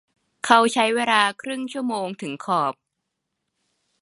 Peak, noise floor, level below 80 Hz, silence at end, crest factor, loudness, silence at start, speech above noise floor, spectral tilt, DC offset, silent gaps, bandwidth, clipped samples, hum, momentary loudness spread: 0 dBFS; -80 dBFS; -76 dBFS; 1.3 s; 24 dB; -21 LUFS; 0.45 s; 58 dB; -3 dB/octave; under 0.1%; none; 11.5 kHz; under 0.1%; none; 13 LU